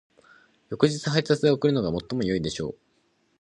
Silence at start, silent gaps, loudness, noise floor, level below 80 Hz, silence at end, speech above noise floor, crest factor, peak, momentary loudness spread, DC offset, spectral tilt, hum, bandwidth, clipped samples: 0.7 s; none; -25 LUFS; -68 dBFS; -54 dBFS; 0.7 s; 44 dB; 20 dB; -6 dBFS; 11 LU; under 0.1%; -6 dB/octave; none; 11 kHz; under 0.1%